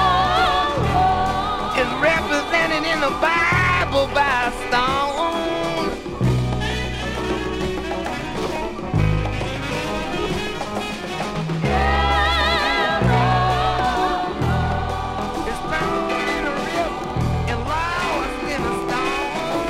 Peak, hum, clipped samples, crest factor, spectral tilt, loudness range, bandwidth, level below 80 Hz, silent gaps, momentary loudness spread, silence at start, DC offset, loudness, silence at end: -6 dBFS; none; under 0.1%; 16 dB; -5 dB/octave; 5 LU; 16 kHz; -32 dBFS; none; 8 LU; 0 s; under 0.1%; -21 LUFS; 0 s